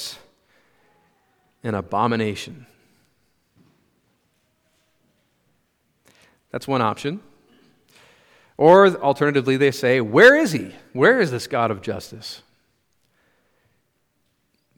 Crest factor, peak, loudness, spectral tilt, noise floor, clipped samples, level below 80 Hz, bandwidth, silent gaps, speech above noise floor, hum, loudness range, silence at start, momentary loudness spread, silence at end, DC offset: 22 dB; 0 dBFS; -18 LUFS; -5.5 dB/octave; -69 dBFS; under 0.1%; -66 dBFS; 18 kHz; none; 51 dB; none; 14 LU; 0 s; 22 LU; 2.4 s; under 0.1%